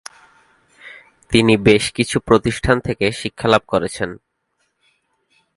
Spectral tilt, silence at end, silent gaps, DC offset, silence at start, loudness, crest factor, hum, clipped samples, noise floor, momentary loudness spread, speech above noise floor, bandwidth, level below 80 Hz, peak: -5 dB/octave; 1.4 s; none; under 0.1%; 0.85 s; -17 LUFS; 20 dB; none; under 0.1%; -69 dBFS; 11 LU; 53 dB; 11.5 kHz; -40 dBFS; 0 dBFS